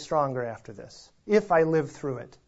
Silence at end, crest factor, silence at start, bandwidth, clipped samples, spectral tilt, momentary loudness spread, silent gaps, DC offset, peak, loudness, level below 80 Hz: 0.2 s; 18 dB; 0 s; 8 kHz; under 0.1%; -6.5 dB/octave; 22 LU; none; under 0.1%; -10 dBFS; -26 LUFS; -60 dBFS